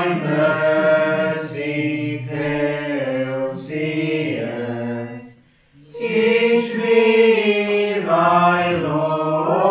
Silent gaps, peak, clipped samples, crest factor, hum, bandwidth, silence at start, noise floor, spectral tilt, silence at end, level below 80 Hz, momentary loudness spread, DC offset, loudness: none; -4 dBFS; under 0.1%; 16 dB; none; 4 kHz; 0 s; -51 dBFS; -10 dB/octave; 0 s; -60 dBFS; 11 LU; under 0.1%; -19 LUFS